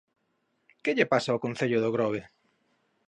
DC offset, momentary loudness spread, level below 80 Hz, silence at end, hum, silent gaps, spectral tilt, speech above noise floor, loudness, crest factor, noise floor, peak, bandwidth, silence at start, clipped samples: under 0.1%; 7 LU; -72 dBFS; 0.85 s; none; none; -6 dB/octave; 48 dB; -28 LUFS; 22 dB; -75 dBFS; -8 dBFS; 10.5 kHz; 0.85 s; under 0.1%